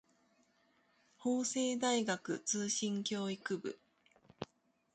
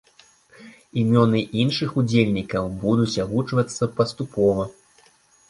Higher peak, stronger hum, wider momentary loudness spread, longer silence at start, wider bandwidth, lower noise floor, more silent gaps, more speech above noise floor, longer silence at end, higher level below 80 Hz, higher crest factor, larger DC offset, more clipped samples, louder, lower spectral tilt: second, -22 dBFS vs -2 dBFS; neither; first, 17 LU vs 7 LU; first, 1.2 s vs 0.6 s; second, 9.4 kHz vs 11.5 kHz; first, -75 dBFS vs -57 dBFS; neither; about the same, 38 dB vs 36 dB; second, 0.5 s vs 0.8 s; second, -80 dBFS vs -50 dBFS; about the same, 18 dB vs 20 dB; neither; neither; second, -37 LUFS vs -22 LUFS; second, -3 dB/octave vs -6.5 dB/octave